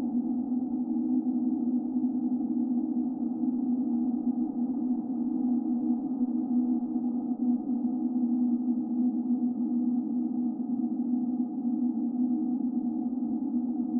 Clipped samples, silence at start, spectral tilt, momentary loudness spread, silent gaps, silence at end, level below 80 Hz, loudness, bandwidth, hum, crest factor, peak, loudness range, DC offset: under 0.1%; 0 s; -12 dB/octave; 3 LU; none; 0 s; -70 dBFS; -29 LUFS; 1.4 kHz; none; 12 dB; -16 dBFS; 1 LU; under 0.1%